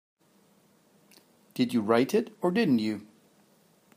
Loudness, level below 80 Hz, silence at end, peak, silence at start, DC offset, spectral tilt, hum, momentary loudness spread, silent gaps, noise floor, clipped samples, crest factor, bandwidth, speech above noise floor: -27 LUFS; -78 dBFS; 0.9 s; -10 dBFS; 1.55 s; under 0.1%; -6 dB/octave; none; 11 LU; none; -64 dBFS; under 0.1%; 20 dB; 15.5 kHz; 38 dB